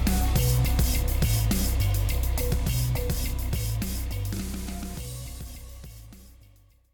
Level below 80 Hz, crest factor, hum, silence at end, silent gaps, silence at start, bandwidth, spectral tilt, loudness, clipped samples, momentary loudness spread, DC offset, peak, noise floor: -28 dBFS; 14 dB; none; 0.6 s; none; 0 s; 18.5 kHz; -5 dB/octave; -27 LUFS; under 0.1%; 17 LU; under 0.1%; -12 dBFS; -56 dBFS